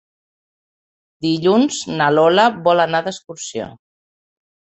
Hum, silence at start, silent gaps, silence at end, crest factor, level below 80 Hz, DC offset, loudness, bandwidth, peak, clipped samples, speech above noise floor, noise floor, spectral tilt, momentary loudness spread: none; 1.2 s; none; 0.95 s; 18 dB; -62 dBFS; under 0.1%; -16 LUFS; 8.2 kHz; 0 dBFS; under 0.1%; over 74 dB; under -90 dBFS; -4.5 dB/octave; 15 LU